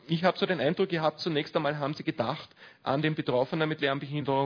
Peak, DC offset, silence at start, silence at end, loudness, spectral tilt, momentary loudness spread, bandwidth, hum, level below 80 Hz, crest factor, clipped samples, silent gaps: -8 dBFS; under 0.1%; 0.1 s; 0 s; -29 LUFS; -7 dB/octave; 5 LU; 5.4 kHz; none; -70 dBFS; 20 dB; under 0.1%; none